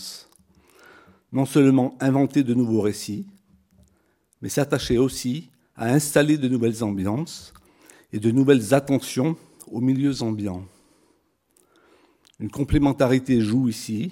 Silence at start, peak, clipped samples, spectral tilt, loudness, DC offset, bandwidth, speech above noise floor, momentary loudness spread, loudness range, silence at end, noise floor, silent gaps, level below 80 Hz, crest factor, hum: 0 s; -2 dBFS; under 0.1%; -6 dB/octave; -22 LUFS; under 0.1%; 17 kHz; 44 dB; 16 LU; 5 LU; 0 s; -65 dBFS; none; -46 dBFS; 20 dB; none